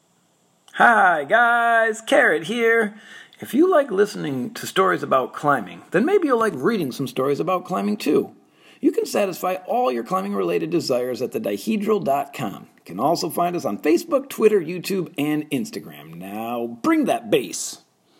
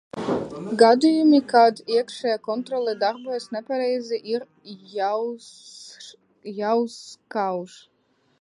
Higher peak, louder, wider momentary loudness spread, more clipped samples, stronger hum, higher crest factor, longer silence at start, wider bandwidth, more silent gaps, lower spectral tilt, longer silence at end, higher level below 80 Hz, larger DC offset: about the same, -2 dBFS vs -2 dBFS; about the same, -21 LUFS vs -22 LUFS; second, 12 LU vs 24 LU; neither; neither; about the same, 20 dB vs 20 dB; first, 0.75 s vs 0.15 s; first, 16.5 kHz vs 11.5 kHz; neither; about the same, -4.5 dB/octave vs -5 dB/octave; second, 0.45 s vs 0.75 s; about the same, -72 dBFS vs -68 dBFS; neither